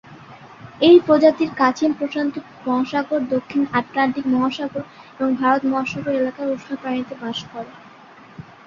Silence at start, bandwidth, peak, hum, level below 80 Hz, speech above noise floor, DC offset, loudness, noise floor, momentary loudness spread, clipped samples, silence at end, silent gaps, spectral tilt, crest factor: 0.1 s; 7.2 kHz; -2 dBFS; none; -60 dBFS; 25 dB; under 0.1%; -20 LUFS; -44 dBFS; 14 LU; under 0.1%; 0.25 s; none; -6 dB/octave; 18 dB